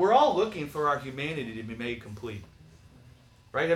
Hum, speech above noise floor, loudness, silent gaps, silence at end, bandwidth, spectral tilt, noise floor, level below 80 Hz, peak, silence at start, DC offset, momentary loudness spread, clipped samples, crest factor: none; 24 dB; -29 LUFS; none; 0 s; 15 kHz; -5.5 dB/octave; -55 dBFS; -60 dBFS; -10 dBFS; 0 s; under 0.1%; 17 LU; under 0.1%; 18 dB